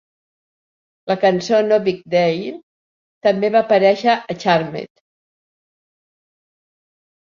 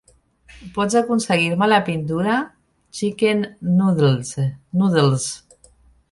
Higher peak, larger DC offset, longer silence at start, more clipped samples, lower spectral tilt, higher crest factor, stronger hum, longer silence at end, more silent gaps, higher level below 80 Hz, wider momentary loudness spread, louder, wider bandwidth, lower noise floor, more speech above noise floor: about the same, -2 dBFS vs -2 dBFS; neither; first, 1.05 s vs 0.55 s; neither; about the same, -5.5 dB/octave vs -5.5 dB/octave; about the same, 18 dB vs 18 dB; neither; first, 2.35 s vs 0.75 s; first, 2.63-3.21 s vs none; second, -66 dBFS vs -54 dBFS; first, 14 LU vs 10 LU; about the same, -17 LUFS vs -19 LUFS; second, 7.4 kHz vs 11.5 kHz; first, under -90 dBFS vs -53 dBFS; first, over 74 dB vs 35 dB